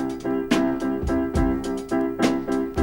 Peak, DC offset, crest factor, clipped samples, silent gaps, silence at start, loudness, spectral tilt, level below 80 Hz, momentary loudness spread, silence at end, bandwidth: -6 dBFS; under 0.1%; 16 dB; under 0.1%; none; 0 s; -24 LUFS; -6 dB/octave; -36 dBFS; 4 LU; 0 s; 17 kHz